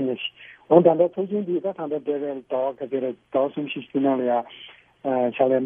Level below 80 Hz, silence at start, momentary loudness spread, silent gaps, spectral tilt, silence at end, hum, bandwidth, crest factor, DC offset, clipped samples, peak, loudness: -72 dBFS; 0 s; 12 LU; none; -10 dB/octave; 0 s; none; 3.7 kHz; 22 dB; under 0.1%; under 0.1%; -2 dBFS; -23 LUFS